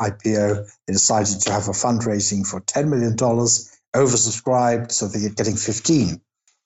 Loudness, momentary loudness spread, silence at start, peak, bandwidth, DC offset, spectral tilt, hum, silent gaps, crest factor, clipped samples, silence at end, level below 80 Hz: -19 LUFS; 6 LU; 0 s; -6 dBFS; 8.8 kHz; under 0.1%; -4 dB/octave; none; 3.88-3.92 s; 14 dB; under 0.1%; 0.5 s; -56 dBFS